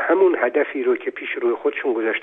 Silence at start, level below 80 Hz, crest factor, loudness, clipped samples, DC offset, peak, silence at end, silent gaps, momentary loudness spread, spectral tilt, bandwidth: 0 s; -74 dBFS; 16 dB; -21 LUFS; under 0.1%; under 0.1%; -4 dBFS; 0 s; none; 7 LU; -6.5 dB/octave; 3.8 kHz